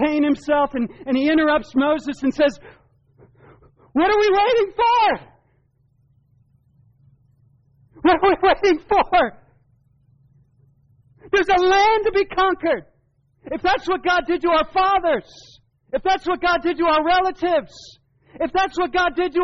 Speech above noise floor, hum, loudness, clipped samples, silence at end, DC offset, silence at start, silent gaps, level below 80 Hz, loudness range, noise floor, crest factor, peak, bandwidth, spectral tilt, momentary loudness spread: 44 dB; none; -19 LUFS; under 0.1%; 0 s; under 0.1%; 0 s; none; -46 dBFS; 2 LU; -63 dBFS; 14 dB; -8 dBFS; 7.4 kHz; -1.5 dB/octave; 8 LU